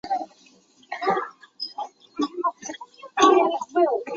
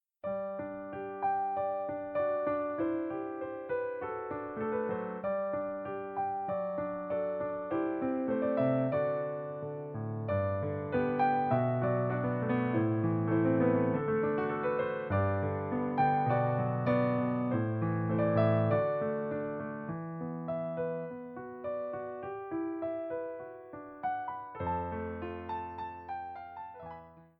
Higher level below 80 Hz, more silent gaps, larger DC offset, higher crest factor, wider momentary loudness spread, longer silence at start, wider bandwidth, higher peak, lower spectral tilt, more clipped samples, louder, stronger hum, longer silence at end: second, -70 dBFS vs -64 dBFS; neither; neither; about the same, 22 dB vs 18 dB; first, 20 LU vs 12 LU; second, 0.05 s vs 0.25 s; first, 7.6 kHz vs 5 kHz; first, -4 dBFS vs -16 dBFS; second, -3 dB/octave vs -11.5 dB/octave; neither; first, -23 LUFS vs -33 LUFS; neither; second, 0 s vs 0.15 s